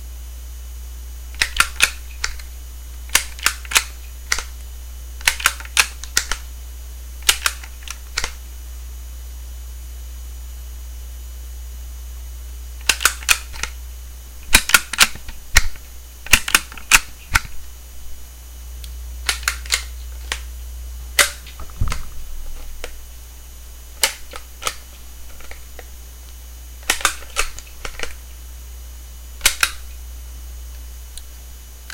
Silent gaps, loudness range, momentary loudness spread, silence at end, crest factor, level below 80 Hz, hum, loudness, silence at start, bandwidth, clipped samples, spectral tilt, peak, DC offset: none; 11 LU; 22 LU; 0 s; 24 dB; -32 dBFS; none; -19 LUFS; 0 s; 17 kHz; under 0.1%; -0.5 dB/octave; 0 dBFS; under 0.1%